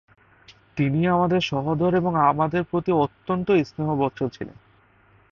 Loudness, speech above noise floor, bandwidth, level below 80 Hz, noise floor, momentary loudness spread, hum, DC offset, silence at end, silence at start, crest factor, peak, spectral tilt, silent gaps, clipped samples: -22 LUFS; 35 dB; 7 kHz; -54 dBFS; -57 dBFS; 10 LU; none; under 0.1%; 0.8 s; 0.5 s; 18 dB; -6 dBFS; -8 dB/octave; none; under 0.1%